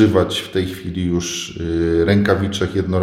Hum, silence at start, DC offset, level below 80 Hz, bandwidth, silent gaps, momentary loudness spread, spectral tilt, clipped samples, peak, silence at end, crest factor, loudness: none; 0 s; under 0.1%; -38 dBFS; 15.5 kHz; none; 9 LU; -5.5 dB/octave; under 0.1%; 0 dBFS; 0 s; 18 dB; -19 LUFS